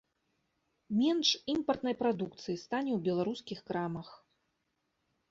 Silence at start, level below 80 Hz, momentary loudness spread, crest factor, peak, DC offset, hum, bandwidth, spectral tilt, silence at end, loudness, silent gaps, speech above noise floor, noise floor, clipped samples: 0.9 s; -72 dBFS; 11 LU; 20 dB; -16 dBFS; under 0.1%; none; 7.8 kHz; -5 dB/octave; 1.15 s; -33 LUFS; none; 48 dB; -81 dBFS; under 0.1%